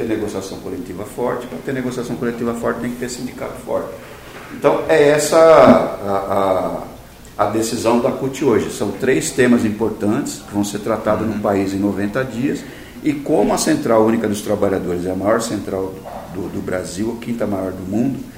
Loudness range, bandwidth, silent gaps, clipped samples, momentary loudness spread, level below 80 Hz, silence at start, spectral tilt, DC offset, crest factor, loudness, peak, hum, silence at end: 9 LU; 16 kHz; none; under 0.1%; 14 LU; -46 dBFS; 0 s; -5.5 dB/octave; under 0.1%; 18 dB; -18 LUFS; 0 dBFS; none; 0 s